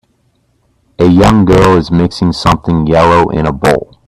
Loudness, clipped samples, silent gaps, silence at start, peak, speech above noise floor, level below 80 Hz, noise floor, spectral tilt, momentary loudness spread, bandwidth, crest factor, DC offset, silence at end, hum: -9 LUFS; under 0.1%; none; 1 s; 0 dBFS; 48 dB; -28 dBFS; -56 dBFS; -7 dB/octave; 6 LU; 14 kHz; 10 dB; under 0.1%; 0.25 s; none